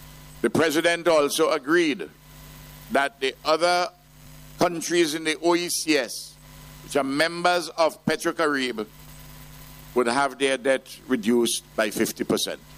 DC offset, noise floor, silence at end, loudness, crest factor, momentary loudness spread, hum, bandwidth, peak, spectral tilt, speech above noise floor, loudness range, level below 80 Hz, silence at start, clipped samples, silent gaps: under 0.1%; -47 dBFS; 0 s; -23 LUFS; 18 dB; 18 LU; none; 15.5 kHz; -6 dBFS; -3 dB/octave; 24 dB; 2 LU; -56 dBFS; 0 s; under 0.1%; none